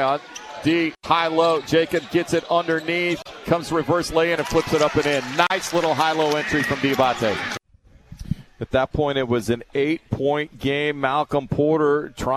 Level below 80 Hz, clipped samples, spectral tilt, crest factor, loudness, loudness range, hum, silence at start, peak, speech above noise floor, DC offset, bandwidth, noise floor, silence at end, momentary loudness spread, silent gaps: -46 dBFS; under 0.1%; -5 dB/octave; 20 dB; -21 LUFS; 3 LU; none; 0 s; -2 dBFS; 32 dB; under 0.1%; 14 kHz; -53 dBFS; 0 s; 6 LU; none